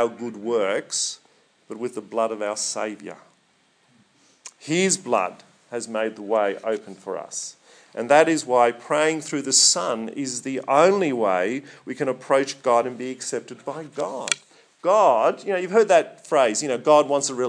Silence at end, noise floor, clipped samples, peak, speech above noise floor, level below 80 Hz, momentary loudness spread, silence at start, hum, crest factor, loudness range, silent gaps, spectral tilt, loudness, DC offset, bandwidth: 0 s; -63 dBFS; under 0.1%; 0 dBFS; 41 dB; -82 dBFS; 15 LU; 0 s; none; 22 dB; 8 LU; none; -2.5 dB/octave; -22 LUFS; under 0.1%; 10.5 kHz